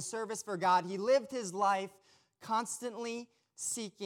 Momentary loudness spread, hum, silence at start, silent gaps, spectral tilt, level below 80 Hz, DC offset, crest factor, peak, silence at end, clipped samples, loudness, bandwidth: 13 LU; none; 0 s; none; -3 dB/octave; -88 dBFS; under 0.1%; 18 dB; -18 dBFS; 0 s; under 0.1%; -34 LUFS; 18 kHz